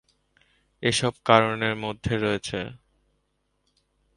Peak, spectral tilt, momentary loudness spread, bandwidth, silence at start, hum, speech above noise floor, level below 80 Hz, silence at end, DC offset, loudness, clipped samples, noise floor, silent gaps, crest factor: -2 dBFS; -4.5 dB/octave; 12 LU; 11.5 kHz; 0.8 s; 50 Hz at -60 dBFS; 49 dB; -52 dBFS; 1.4 s; under 0.1%; -24 LUFS; under 0.1%; -73 dBFS; none; 26 dB